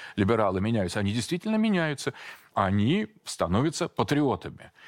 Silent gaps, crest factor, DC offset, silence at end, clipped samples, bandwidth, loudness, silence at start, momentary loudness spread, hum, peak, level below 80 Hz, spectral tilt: none; 18 dB; under 0.1%; 0.2 s; under 0.1%; 16 kHz; -27 LUFS; 0 s; 9 LU; none; -10 dBFS; -56 dBFS; -6 dB/octave